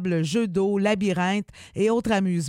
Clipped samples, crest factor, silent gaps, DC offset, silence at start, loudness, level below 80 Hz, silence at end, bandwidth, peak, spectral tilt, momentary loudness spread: under 0.1%; 16 dB; none; under 0.1%; 0 s; -24 LUFS; -56 dBFS; 0 s; 12.5 kHz; -8 dBFS; -6 dB/octave; 4 LU